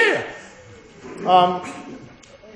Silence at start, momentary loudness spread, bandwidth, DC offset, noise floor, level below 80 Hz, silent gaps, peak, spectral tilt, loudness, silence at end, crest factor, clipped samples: 0 s; 25 LU; 10.5 kHz; under 0.1%; -45 dBFS; -60 dBFS; none; -2 dBFS; -4.5 dB/octave; -19 LUFS; 0.5 s; 20 dB; under 0.1%